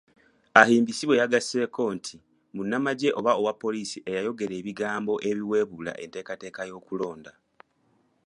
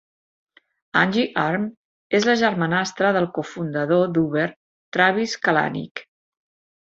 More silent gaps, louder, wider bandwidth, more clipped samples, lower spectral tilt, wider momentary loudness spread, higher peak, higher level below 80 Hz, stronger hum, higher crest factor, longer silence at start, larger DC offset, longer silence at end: second, none vs 1.77-2.10 s, 4.56-4.92 s, 5.91-5.95 s; second, -26 LUFS vs -21 LUFS; first, 11.5 kHz vs 8 kHz; neither; about the same, -4.5 dB/octave vs -5.5 dB/octave; first, 16 LU vs 9 LU; about the same, 0 dBFS vs -2 dBFS; second, -70 dBFS vs -64 dBFS; neither; first, 26 dB vs 20 dB; second, 0.55 s vs 0.95 s; neither; first, 1 s vs 0.8 s